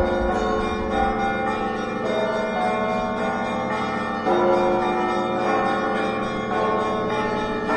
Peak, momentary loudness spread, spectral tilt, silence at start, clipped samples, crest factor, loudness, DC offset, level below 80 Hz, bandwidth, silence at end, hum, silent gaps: -8 dBFS; 4 LU; -6 dB/octave; 0 s; under 0.1%; 14 dB; -23 LUFS; under 0.1%; -42 dBFS; 11 kHz; 0 s; none; none